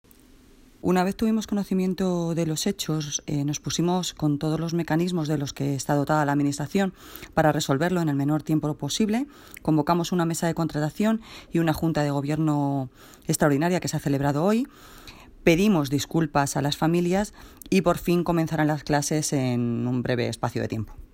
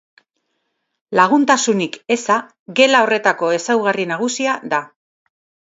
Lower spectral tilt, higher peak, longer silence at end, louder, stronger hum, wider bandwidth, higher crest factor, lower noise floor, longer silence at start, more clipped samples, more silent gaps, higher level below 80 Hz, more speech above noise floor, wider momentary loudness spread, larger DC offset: first, -5.5 dB/octave vs -3 dB/octave; second, -6 dBFS vs 0 dBFS; second, 0.1 s vs 0.9 s; second, -25 LUFS vs -16 LUFS; neither; first, 16.5 kHz vs 8 kHz; about the same, 18 dB vs 18 dB; second, -53 dBFS vs -72 dBFS; second, 0.85 s vs 1.1 s; neither; second, none vs 2.59-2.66 s; first, -50 dBFS vs -70 dBFS; second, 28 dB vs 55 dB; about the same, 6 LU vs 8 LU; neither